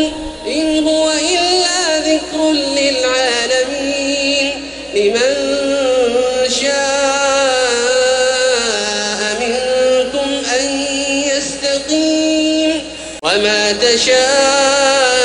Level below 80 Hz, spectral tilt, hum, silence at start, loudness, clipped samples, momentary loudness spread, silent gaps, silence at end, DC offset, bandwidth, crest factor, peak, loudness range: -44 dBFS; -1 dB/octave; none; 0 s; -14 LUFS; under 0.1%; 6 LU; none; 0 s; under 0.1%; 11 kHz; 14 dB; 0 dBFS; 2 LU